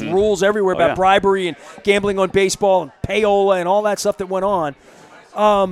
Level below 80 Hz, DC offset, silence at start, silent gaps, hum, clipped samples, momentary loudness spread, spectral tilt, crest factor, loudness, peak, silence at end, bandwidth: -46 dBFS; under 0.1%; 0 s; none; none; under 0.1%; 7 LU; -4.5 dB/octave; 16 dB; -17 LUFS; -2 dBFS; 0 s; 14 kHz